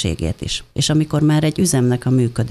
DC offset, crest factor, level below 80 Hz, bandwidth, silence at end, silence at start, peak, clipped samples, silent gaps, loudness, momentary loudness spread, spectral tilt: under 0.1%; 12 dB; -36 dBFS; 13.5 kHz; 0 s; 0 s; -4 dBFS; under 0.1%; none; -17 LUFS; 7 LU; -5.5 dB/octave